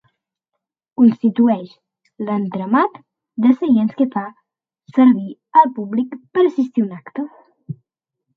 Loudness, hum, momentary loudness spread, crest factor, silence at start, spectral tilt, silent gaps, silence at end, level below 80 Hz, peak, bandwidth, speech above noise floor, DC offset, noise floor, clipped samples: -17 LUFS; none; 18 LU; 18 dB; 1 s; -9.5 dB/octave; none; 0.65 s; -70 dBFS; 0 dBFS; 4.6 kHz; 63 dB; under 0.1%; -80 dBFS; under 0.1%